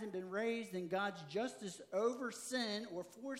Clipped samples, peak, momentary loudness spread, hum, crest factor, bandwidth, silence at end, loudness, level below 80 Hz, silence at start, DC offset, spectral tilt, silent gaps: under 0.1%; -26 dBFS; 6 LU; none; 16 dB; 16 kHz; 0 s; -41 LUFS; under -90 dBFS; 0 s; under 0.1%; -4 dB/octave; none